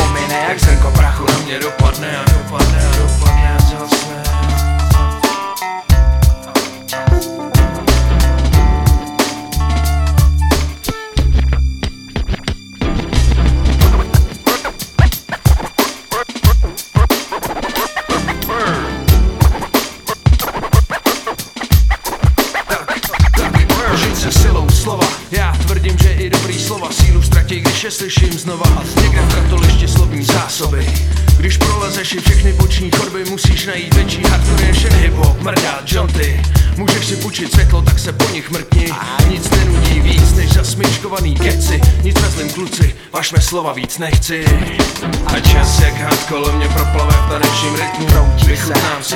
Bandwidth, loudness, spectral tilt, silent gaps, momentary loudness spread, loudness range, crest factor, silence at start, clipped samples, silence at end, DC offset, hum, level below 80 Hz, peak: 17.5 kHz; -14 LUFS; -5 dB/octave; none; 6 LU; 3 LU; 12 dB; 0 s; 0.1%; 0 s; under 0.1%; none; -14 dBFS; 0 dBFS